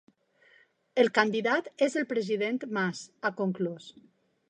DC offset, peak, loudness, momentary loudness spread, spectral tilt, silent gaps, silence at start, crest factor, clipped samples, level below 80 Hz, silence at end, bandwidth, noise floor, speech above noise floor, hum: under 0.1%; -6 dBFS; -29 LUFS; 9 LU; -5 dB/octave; none; 0.95 s; 24 dB; under 0.1%; -84 dBFS; 0.6 s; 10 kHz; -63 dBFS; 34 dB; none